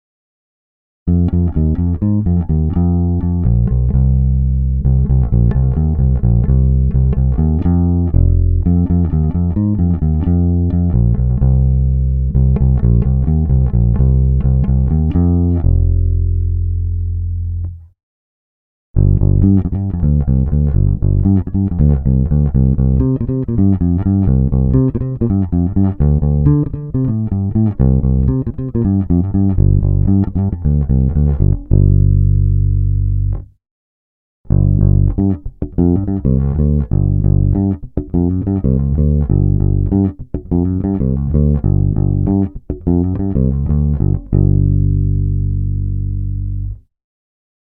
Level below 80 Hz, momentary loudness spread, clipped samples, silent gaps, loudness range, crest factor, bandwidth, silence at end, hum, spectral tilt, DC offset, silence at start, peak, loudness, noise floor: -18 dBFS; 5 LU; under 0.1%; 18.03-18.94 s, 33.71-34.44 s; 3 LU; 14 dB; 2 kHz; 0.85 s; none; -15 dB/octave; under 0.1%; 1.05 s; 0 dBFS; -15 LUFS; under -90 dBFS